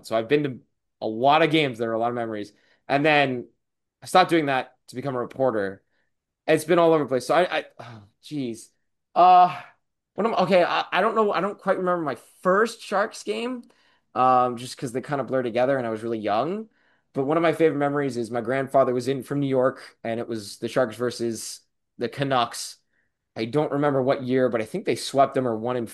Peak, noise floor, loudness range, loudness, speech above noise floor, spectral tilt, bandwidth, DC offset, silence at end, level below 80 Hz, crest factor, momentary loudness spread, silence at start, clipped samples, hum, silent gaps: -4 dBFS; -78 dBFS; 5 LU; -23 LUFS; 55 dB; -5.5 dB/octave; 12.5 kHz; under 0.1%; 0 s; -72 dBFS; 20 dB; 15 LU; 0.05 s; under 0.1%; none; none